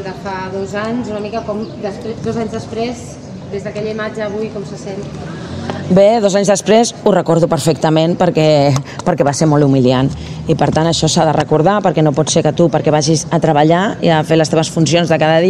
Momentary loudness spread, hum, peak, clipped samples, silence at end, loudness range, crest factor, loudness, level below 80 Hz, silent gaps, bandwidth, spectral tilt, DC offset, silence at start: 13 LU; none; 0 dBFS; under 0.1%; 0 s; 10 LU; 14 dB; -14 LUFS; -42 dBFS; none; 13 kHz; -5.5 dB/octave; under 0.1%; 0 s